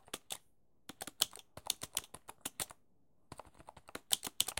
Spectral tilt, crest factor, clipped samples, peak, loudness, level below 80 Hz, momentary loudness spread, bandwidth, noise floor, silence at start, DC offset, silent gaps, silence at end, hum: 0 dB/octave; 34 dB; under 0.1%; -10 dBFS; -39 LUFS; -72 dBFS; 20 LU; 17 kHz; -76 dBFS; 0.15 s; under 0.1%; none; 0.05 s; none